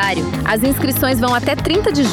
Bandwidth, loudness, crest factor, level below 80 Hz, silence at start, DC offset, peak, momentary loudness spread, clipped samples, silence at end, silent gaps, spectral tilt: 18 kHz; -16 LUFS; 10 dB; -34 dBFS; 0 s; under 0.1%; -6 dBFS; 3 LU; under 0.1%; 0 s; none; -5 dB/octave